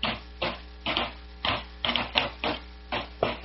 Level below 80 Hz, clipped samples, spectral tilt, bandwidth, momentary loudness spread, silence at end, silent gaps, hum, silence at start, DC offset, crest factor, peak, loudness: -44 dBFS; under 0.1%; -1 dB/octave; 6 kHz; 8 LU; 0 s; none; none; 0 s; under 0.1%; 30 dB; -2 dBFS; -30 LUFS